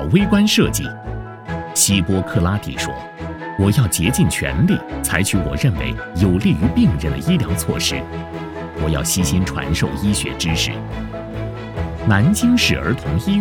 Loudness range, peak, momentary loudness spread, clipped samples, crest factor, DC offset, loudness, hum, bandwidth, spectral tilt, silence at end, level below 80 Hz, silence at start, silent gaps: 3 LU; 0 dBFS; 14 LU; under 0.1%; 18 dB; under 0.1%; -18 LUFS; none; 19 kHz; -4.5 dB/octave; 0 s; -32 dBFS; 0 s; none